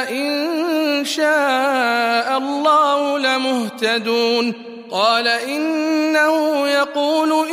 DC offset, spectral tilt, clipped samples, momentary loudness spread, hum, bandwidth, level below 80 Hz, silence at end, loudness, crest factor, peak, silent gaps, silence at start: under 0.1%; -2.5 dB/octave; under 0.1%; 5 LU; none; 15.5 kHz; -74 dBFS; 0 s; -17 LUFS; 14 dB; -4 dBFS; none; 0 s